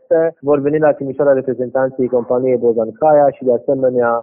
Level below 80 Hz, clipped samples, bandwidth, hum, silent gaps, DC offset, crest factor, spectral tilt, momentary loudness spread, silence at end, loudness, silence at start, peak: -60 dBFS; under 0.1%; 3 kHz; none; none; under 0.1%; 12 dB; -9 dB/octave; 5 LU; 0 s; -15 LUFS; 0.1 s; -2 dBFS